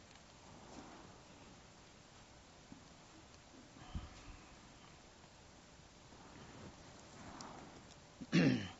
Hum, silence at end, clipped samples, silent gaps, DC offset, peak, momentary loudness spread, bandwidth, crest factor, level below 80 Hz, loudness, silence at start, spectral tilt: none; 0 s; under 0.1%; none; under 0.1%; -22 dBFS; 9 LU; 8 kHz; 26 dB; -64 dBFS; -43 LUFS; 0 s; -5.5 dB/octave